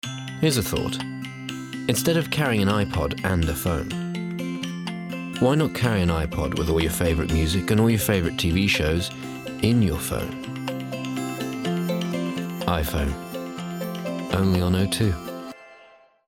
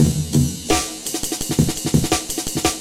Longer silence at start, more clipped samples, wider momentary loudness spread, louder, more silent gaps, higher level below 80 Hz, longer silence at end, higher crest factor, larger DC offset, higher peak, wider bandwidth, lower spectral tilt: about the same, 0.05 s vs 0 s; neither; first, 11 LU vs 5 LU; second, -24 LUFS vs -20 LUFS; neither; second, -40 dBFS vs -34 dBFS; first, 0.4 s vs 0 s; about the same, 20 dB vs 16 dB; neither; about the same, -4 dBFS vs -2 dBFS; about the same, 18 kHz vs 16.5 kHz; first, -5.5 dB/octave vs -4 dB/octave